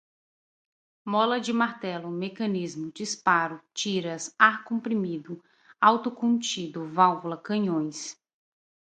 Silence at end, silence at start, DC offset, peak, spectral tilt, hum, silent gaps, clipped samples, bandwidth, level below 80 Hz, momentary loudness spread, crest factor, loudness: 0.8 s; 1.05 s; under 0.1%; -2 dBFS; -4 dB/octave; none; none; under 0.1%; 9.4 kHz; -78 dBFS; 13 LU; 24 dB; -26 LUFS